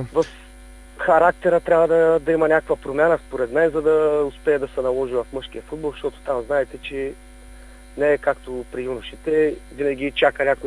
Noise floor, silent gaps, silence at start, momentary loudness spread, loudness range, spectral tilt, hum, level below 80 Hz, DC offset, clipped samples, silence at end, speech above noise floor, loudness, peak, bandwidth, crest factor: -42 dBFS; none; 0 s; 13 LU; 7 LU; -6 dB/octave; none; -44 dBFS; under 0.1%; under 0.1%; 0 s; 22 dB; -21 LUFS; -2 dBFS; 11 kHz; 18 dB